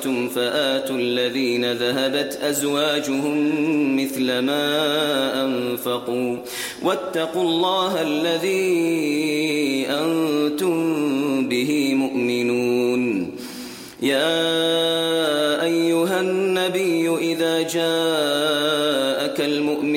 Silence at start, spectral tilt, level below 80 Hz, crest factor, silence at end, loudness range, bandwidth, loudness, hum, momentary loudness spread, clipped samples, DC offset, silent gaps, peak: 0 s; -4 dB/octave; -64 dBFS; 12 dB; 0 s; 2 LU; 16.5 kHz; -21 LUFS; none; 4 LU; under 0.1%; under 0.1%; none; -8 dBFS